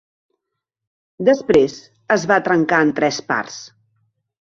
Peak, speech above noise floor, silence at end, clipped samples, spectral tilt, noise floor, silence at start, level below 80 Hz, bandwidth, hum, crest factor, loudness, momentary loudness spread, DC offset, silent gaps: 0 dBFS; 63 dB; 0.75 s; under 0.1%; -5 dB/octave; -80 dBFS; 1.2 s; -56 dBFS; 7.8 kHz; none; 18 dB; -17 LUFS; 11 LU; under 0.1%; none